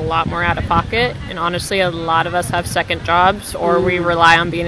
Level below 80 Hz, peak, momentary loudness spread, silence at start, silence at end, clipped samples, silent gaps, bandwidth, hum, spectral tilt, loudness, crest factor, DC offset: -34 dBFS; 0 dBFS; 8 LU; 0 s; 0 s; under 0.1%; none; 11 kHz; none; -4.5 dB/octave; -16 LUFS; 16 dB; under 0.1%